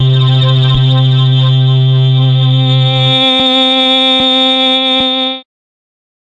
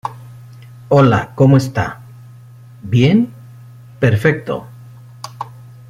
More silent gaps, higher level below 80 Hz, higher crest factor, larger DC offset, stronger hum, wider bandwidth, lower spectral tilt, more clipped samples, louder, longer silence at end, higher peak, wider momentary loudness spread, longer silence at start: neither; first, -38 dBFS vs -46 dBFS; second, 8 dB vs 16 dB; neither; neither; second, 7.8 kHz vs 13.5 kHz; about the same, -6.5 dB/octave vs -7.5 dB/octave; neither; first, -8 LUFS vs -15 LUFS; first, 0.95 s vs 0.4 s; about the same, -2 dBFS vs 0 dBFS; second, 2 LU vs 22 LU; about the same, 0 s vs 0.05 s